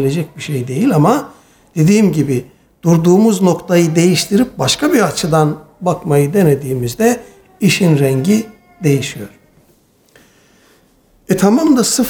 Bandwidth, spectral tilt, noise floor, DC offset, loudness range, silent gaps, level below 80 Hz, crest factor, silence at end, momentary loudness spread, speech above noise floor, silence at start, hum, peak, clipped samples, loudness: 19.5 kHz; -5.5 dB/octave; -52 dBFS; under 0.1%; 5 LU; none; -48 dBFS; 12 dB; 0 s; 10 LU; 40 dB; 0 s; none; 0 dBFS; under 0.1%; -13 LUFS